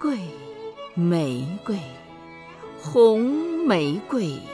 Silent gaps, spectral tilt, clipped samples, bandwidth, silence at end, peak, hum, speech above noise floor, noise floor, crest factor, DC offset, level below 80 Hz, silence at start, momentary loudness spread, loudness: none; -7 dB/octave; under 0.1%; 11 kHz; 0 s; -6 dBFS; none; 21 dB; -43 dBFS; 18 dB; under 0.1%; -64 dBFS; 0 s; 23 LU; -23 LUFS